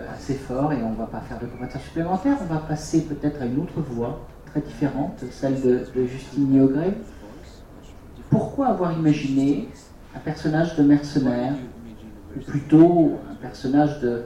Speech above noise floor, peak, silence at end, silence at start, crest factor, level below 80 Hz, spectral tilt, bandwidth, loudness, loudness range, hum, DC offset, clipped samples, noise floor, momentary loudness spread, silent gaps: 21 dB; -4 dBFS; 0 s; 0 s; 20 dB; -44 dBFS; -8 dB/octave; 11 kHz; -23 LUFS; 5 LU; none; under 0.1%; under 0.1%; -43 dBFS; 16 LU; none